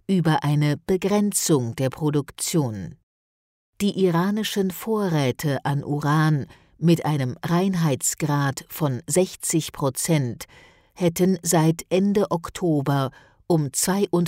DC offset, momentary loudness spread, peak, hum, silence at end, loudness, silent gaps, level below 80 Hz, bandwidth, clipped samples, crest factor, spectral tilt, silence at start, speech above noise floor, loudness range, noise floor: under 0.1%; 6 LU; -8 dBFS; none; 0 s; -23 LUFS; 3.03-3.73 s; -56 dBFS; 16 kHz; under 0.1%; 14 dB; -5.5 dB/octave; 0.1 s; over 68 dB; 2 LU; under -90 dBFS